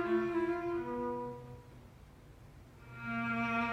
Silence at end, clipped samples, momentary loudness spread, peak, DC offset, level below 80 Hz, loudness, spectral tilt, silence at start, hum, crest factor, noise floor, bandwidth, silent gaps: 0 s; under 0.1%; 24 LU; -22 dBFS; under 0.1%; -62 dBFS; -36 LUFS; -7 dB/octave; 0 s; none; 14 dB; -56 dBFS; 9.2 kHz; none